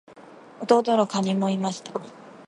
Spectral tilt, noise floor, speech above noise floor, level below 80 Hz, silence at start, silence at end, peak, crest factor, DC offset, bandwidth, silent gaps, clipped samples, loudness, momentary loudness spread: -6 dB/octave; -47 dBFS; 24 dB; -74 dBFS; 0.1 s; 0.05 s; -4 dBFS; 20 dB; under 0.1%; 11 kHz; none; under 0.1%; -23 LUFS; 16 LU